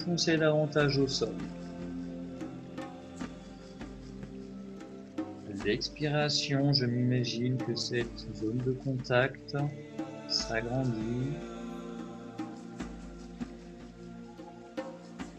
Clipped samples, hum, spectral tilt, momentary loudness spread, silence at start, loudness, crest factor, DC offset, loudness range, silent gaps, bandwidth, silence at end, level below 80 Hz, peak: under 0.1%; none; -5.5 dB/octave; 18 LU; 0 s; -33 LUFS; 22 dB; under 0.1%; 13 LU; none; 8.8 kHz; 0 s; -56 dBFS; -12 dBFS